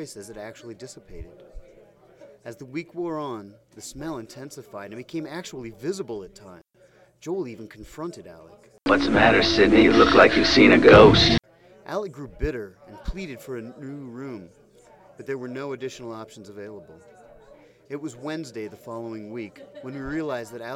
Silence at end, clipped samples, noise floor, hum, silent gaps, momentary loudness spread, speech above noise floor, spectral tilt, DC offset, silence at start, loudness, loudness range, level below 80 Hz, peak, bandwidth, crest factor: 0 s; under 0.1%; -57 dBFS; none; none; 26 LU; 34 dB; -5.5 dB/octave; under 0.1%; 0 s; -19 LUFS; 21 LU; -42 dBFS; -2 dBFS; 13.5 kHz; 22 dB